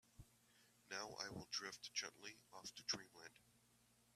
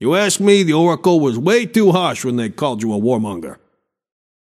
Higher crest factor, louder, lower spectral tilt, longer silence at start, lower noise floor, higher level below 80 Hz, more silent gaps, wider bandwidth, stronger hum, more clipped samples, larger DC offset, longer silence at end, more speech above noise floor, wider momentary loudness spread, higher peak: first, 26 dB vs 16 dB; second, -49 LUFS vs -15 LUFS; second, -1 dB/octave vs -5 dB/octave; first, 0.15 s vs 0 s; first, -76 dBFS vs -66 dBFS; second, -80 dBFS vs -62 dBFS; neither; about the same, 15 kHz vs 15 kHz; first, 60 Hz at -80 dBFS vs none; neither; neither; second, 0.05 s vs 1 s; second, 23 dB vs 51 dB; first, 17 LU vs 8 LU; second, -28 dBFS vs 0 dBFS